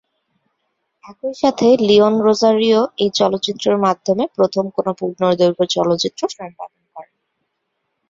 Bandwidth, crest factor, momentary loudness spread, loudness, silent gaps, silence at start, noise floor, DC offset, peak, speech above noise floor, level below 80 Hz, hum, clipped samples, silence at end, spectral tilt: 7.8 kHz; 16 dB; 14 LU; -16 LUFS; none; 1.05 s; -73 dBFS; under 0.1%; -2 dBFS; 57 dB; -60 dBFS; none; under 0.1%; 1.1 s; -5 dB/octave